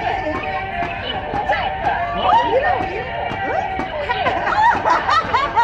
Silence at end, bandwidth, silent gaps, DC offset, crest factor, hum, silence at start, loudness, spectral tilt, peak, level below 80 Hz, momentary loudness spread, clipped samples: 0 s; 8.6 kHz; none; under 0.1%; 14 dB; none; 0 s; -19 LUFS; -5 dB/octave; -4 dBFS; -38 dBFS; 8 LU; under 0.1%